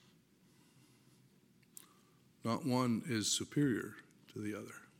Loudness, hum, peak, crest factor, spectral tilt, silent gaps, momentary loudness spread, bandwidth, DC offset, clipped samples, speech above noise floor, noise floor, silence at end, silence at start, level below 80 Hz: -37 LUFS; none; -20 dBFS; 20 dB; -4 dB/octave; none; 23 LU; 16.5 kHz; under 0.1%; under 0.1%; 32 dB; -68 dBFS; 0.15 s; 2.45 s; -80 dBFS